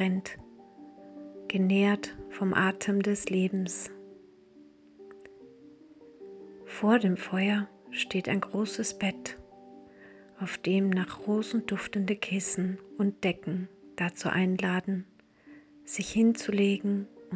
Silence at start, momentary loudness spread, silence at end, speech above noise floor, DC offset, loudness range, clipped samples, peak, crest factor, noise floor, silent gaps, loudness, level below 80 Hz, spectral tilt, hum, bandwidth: 0 s; 21 LU; 0 s; 27 dB; under 0.1%; 5 LU; under 0.1%; -10 dBFS; 20 dB; -56 dBFS; none; -30 LUFS; -66 dBFS; -5.5 dB/octave; none; 8 kHz